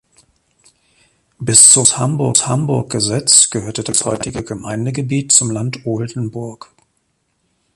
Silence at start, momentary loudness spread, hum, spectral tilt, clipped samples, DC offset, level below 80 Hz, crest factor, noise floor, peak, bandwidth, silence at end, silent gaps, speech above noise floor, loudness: 1.4 s; 18 LU; none; -3 dB/octave; 0.2%; under 0.1%; -48 dBFS; 16 dB; -66 dBFS; 0 dBFS; 16 kHz; 1.2 s; none; 51 dB; -12 LUFS